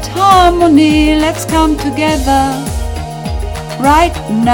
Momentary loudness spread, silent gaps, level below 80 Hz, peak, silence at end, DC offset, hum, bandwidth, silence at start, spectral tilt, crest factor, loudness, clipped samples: 13 LU; none; -22 dBFS; 0 dBFS; 0 s; under 0.1%; none; 18 kHz; 0 s; -5 dB/octave; 10 dB; -11 LUFS; 0.7%